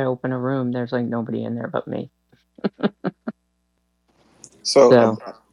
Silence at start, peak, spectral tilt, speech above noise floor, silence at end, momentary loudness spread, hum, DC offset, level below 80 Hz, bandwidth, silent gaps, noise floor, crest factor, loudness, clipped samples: 0 s; -2 dBFS; -5.5 dB/octave; 49 dB; 0.2 s; 18 LU; none; under 0.1%; -66 dBFS; 11 kHz; none; -69 dBFS; 20 dB; -21 LUFS; under 0.1%